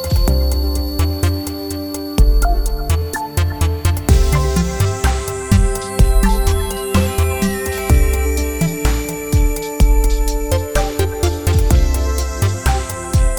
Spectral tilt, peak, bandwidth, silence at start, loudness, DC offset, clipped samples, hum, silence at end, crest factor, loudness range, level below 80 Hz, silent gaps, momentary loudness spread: -5.5 dB/octave; 0 dBFS; over 20 kHz; 0 s; -17 LUFS; under 0.1%; under 0.1%; none; 0 s; 14 dB; 2 LU; -16 dBFS; none; 5 LU